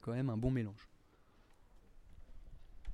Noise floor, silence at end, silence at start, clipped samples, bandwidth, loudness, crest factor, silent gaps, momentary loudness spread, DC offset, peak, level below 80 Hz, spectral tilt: -67 dBFS; 0 s; 0.05 s; under 0.1%; 10.5 kHz; -38 LUFS; 20 dB; none; 26 LU; under 0.1%; -22 dBFS; -54 dBFS; -9 dB/octave